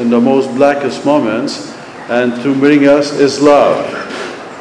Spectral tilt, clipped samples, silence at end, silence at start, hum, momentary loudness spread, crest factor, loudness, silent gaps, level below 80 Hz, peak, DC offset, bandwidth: -5.5 dB/octave; under 0.1%; 0 s; 0 s; none; 15 LU; 12 dB; -11 LUFS; none; -54 dBFS; 0 dBFS; under 0.1%; 10.5 kHz